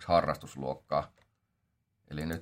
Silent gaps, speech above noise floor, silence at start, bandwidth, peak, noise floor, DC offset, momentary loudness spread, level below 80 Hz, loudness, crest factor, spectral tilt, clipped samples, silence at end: none; 47 dB; 0 s; 16 kHz; -14 dBFS; -79 dBFS; under 0.1%; 15 LU; -58 dBFS; -33 LUFS; 22 dB; -6 dB/octave; under 0.1%; 0 s